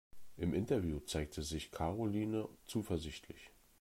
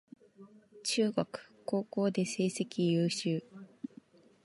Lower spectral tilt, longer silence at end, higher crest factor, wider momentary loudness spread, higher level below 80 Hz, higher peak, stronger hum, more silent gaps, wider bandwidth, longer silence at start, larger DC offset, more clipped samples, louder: about the same, -6 dB/octave vs -5 dB/octave; second, 0.3 s vs 0.8 s; about the same, 18 dB vs 20 dB; second, 13 LU vs 17 LU; first, -56 dBFS vs -78 dBFS; second, -22 dBFS vs -14 dBFS; neither; neither; first, 16 kHz vs 11.5 kHz; second, 0.15 s vs 0.4 s; neither; neither; second, -40 LUFS vs -33 LUFS